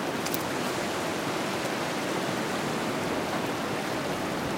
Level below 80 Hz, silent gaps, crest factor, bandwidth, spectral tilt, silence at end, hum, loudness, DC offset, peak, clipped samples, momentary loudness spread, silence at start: -60 dBFS; none; 20 dB; 16 kHz; -4 dB/octave; 0 s; none; -30 LUFS; under 0.1%; -10 dBFS; under 0.1%; 1 LU; 0 s